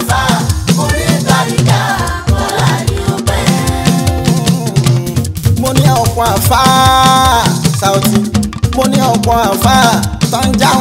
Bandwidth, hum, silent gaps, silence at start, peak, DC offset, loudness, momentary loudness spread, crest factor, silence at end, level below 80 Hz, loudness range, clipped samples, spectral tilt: 16.5 kHz; none; none; 0 s; 0 dBFS; under 0.1%; -11 LUFS; 7 LU; 10 dB; 0 s; -24 dBFS; 3 LU; under 0.1%; -4.5 dB/octave